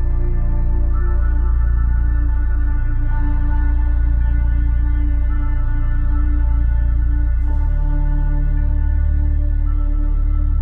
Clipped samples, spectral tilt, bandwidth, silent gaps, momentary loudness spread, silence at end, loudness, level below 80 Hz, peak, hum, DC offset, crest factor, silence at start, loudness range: under 0.1%; -11.5 dB/octave; 2.2 kHz; none; 3 LU; 0 s; -20 LUFS; -14 dBFS; -8 dBFS; none; under 0.1%; 8 dB; 0 s; 0 LU